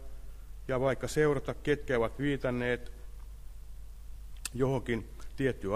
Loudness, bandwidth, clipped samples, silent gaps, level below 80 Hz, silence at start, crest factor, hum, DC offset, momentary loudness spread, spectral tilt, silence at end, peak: -32 LUFS; 15.5 kHz; under 0.1%; none; -44 dBFS; 0 s; 18 dB; none; under 0.1%; 21 LU; -6 dB/octave; 0 s; -14 dBFS